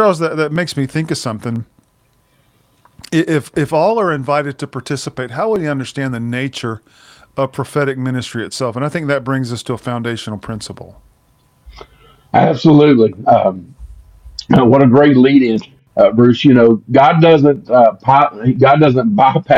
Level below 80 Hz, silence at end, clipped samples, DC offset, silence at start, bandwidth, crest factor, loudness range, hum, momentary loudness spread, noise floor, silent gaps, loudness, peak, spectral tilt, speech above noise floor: -48 dBFS; 0 s; under 0.1%; under 0.1%; 0 s; 12.5 kHz; 14 dB; 11 LU; none; 15 LU; -57 dBFS; none; -13 LUFS; 0 dBFS; -7 dB/octave; 44 dB